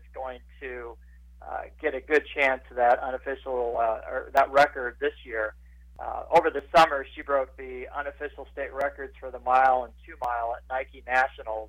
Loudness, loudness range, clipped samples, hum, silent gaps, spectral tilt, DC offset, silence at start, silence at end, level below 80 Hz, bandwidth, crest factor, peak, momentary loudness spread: -26 LUFS; 4 LU; under 0.1%; none; none; -4.5 dB/octave; under 0.1%; 0 s; 0 s; -50 dBFS; 16 kHz; 16 dB; -10 dBFS; 17 LU